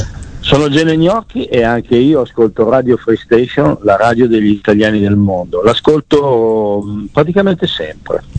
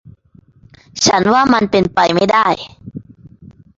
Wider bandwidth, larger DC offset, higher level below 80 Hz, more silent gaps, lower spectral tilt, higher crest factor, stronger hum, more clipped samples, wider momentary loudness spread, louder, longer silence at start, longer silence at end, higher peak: first, 9 kHz vs 7.8 kHz; neither; first, -36 dBFS vs -46 dBFS; neither; first, -7 dB/octave vs -4 dB/octave; about the same, 12 dB vs 16 dB; neither; neither; second, 7 LU vs 22 LU; about the same, -12 LUFS vs -13 LUFS; second, 0 s vs 0.95 s; second, 0 s vs 0.75 s; about the same, 0 dBFS vs 0 dBFS